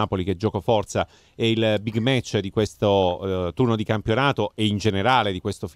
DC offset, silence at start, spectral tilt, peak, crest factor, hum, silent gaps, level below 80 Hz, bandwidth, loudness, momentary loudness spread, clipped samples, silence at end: under 0.1%; 0 s; -6 dB/octave; -6 dBFS; 16 dB; none; none; -50 dBFS; 13.5 kHz; -23 LUFS; 6 LU; under 0.1%; 0.05 s